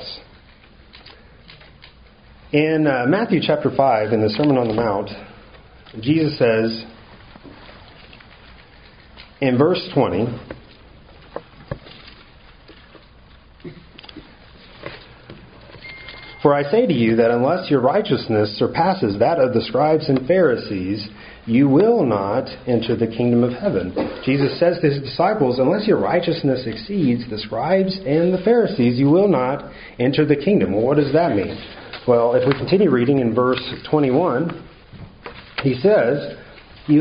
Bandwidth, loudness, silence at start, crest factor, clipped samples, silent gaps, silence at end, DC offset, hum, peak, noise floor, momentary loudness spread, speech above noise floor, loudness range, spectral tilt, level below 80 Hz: 5.2 kHz; -18 LUFS; 0 s; 18 dB; under 0.1%; none; 0 s; under 0.1%; none; 0 dBFS; -47 dBFS; 20 LU; 30 dB; 7 LU; -5.5 dB/octave; -50 dBFS